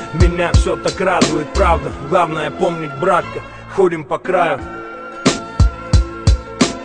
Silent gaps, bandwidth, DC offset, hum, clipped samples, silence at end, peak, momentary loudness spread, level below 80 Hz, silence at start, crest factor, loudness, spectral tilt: none; 10 kHz; 0.2%; none; under 0.1%; 0 s; 0 dBFS; 8 LU; -22 dBFS; 0 s; 16 dB; -17 LUFS; -5.5 dB/octave